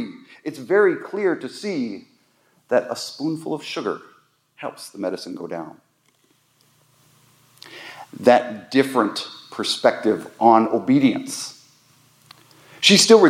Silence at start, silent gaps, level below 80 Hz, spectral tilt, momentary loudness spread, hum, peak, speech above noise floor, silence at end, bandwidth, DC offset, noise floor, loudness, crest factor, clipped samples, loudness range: 0 s; none; -76 dBFS; -3.5 dB/octave; 19 LU; none; 0 dBFS; 43 dB; 0 s; 16 kHz; under 0.1%; -62 dBFS; -20 LUFS; 20 dB; under 0.1%; 15 LU